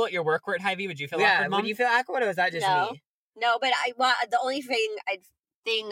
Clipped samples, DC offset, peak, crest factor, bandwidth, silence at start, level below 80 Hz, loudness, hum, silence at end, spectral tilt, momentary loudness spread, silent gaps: under 0.1%; under 0.1%; -8 dBFS; 18 dB; 16.5 kHz; 0 s; -80 dBFS; -25 LUFS; none; 0 s; -3.5 dB/octave; 9 LU; 3.06-3.32 s, 5.39-5.44 s, 5.55-5.63 s